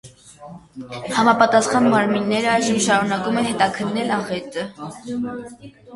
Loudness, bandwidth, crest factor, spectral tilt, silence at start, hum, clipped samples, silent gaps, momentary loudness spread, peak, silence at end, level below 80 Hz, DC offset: -19 LUFS; 11.5 kHz; 20 dB; -4 dB/octave; 0.05 s; none; under 0.1%; none; 19 LU; 0 dBFS; 0 s; -58 dBFS; under 0.1%